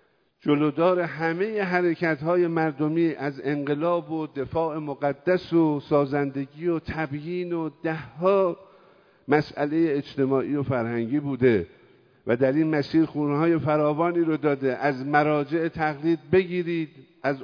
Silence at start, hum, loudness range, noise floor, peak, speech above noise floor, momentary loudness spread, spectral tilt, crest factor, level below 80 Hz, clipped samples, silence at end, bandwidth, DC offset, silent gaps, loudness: 0.45 s; none; 3 LU; -57 dBFS; -6 dBFS; 33 dB; 8 LU; -9 dB/octave; 18 dB; -60 dBFS; under 0.1%; 0 s; 5.4 kHz; under 0.1%; none; -25 LUFS